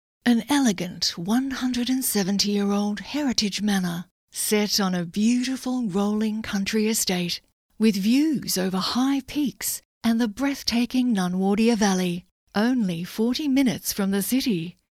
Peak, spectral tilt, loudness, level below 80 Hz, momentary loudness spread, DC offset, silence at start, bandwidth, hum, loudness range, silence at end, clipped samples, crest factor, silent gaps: -6 dBFS; -4 dB/octave; -24 LUFS; -56 dBFS; 6 LU; under 0.1%; 0.25 s; 16.5 kHz; none; 1 LU; 0.2 s; under 0.1%; 18 dB; 4.11-4.28 s, 7.52-7.69 s, 9.85-10.01 s, 12.31-12.47 s